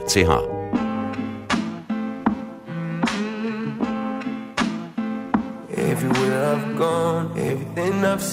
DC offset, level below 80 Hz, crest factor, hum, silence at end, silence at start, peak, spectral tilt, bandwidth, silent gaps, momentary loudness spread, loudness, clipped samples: under 0.1%; -48 dBFS; 20 dB; none; 0 s; 0 s; -4 dBFS; -5 dB/octave; 16 kHz; none; 8 LU; -24 LUFS; under 0.1%